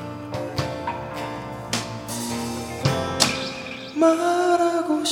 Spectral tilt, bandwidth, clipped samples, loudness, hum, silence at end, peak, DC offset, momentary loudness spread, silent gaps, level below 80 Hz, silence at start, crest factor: -4 dB/octave; 16.5 kHz; under 0.1%; -24 LUFS; none; 0 s; 0 dBFS; under 0.1%; 11 LU; none; -52 dBFS; 0 s; 24 dB